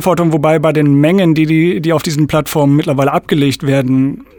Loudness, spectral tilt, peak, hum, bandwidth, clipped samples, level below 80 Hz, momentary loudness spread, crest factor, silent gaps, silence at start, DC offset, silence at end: -12 LUFS; -7 dB/octave; 0 dBFS; none; 19.5 kHz; under 0.1%; -44 dBFS; 4 LU; 12 dB; none; 0 s; under 0.1%; 0.15 s